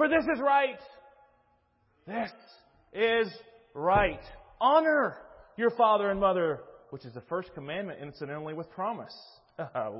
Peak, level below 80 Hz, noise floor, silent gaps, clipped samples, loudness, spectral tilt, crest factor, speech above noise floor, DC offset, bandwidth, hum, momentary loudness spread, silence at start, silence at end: -10 dBFS; -54 dBFS; -70 dBFS; none; under 0.1%; -29 LUFS; -9 dB/octave; 20 dB; 41 dB; under 0.1%; 5.8 kHz; none; 22 LU; 0 s; 0 s